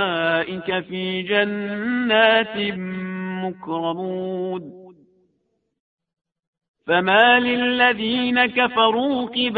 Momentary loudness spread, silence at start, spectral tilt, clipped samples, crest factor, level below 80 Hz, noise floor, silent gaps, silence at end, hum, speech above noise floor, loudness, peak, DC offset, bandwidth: 13 LU; 0 s; -8 dB/octave; under 0.1%; 20 dB; -62 dBFS; -71 dBFS; 5.80-5.98 s, 6.47-6.53 s, 6.68-6.74 s; 0 s; none; 51 dB; -20 LUFS; 0 dBFS; under 0.1%; 4.8 kHz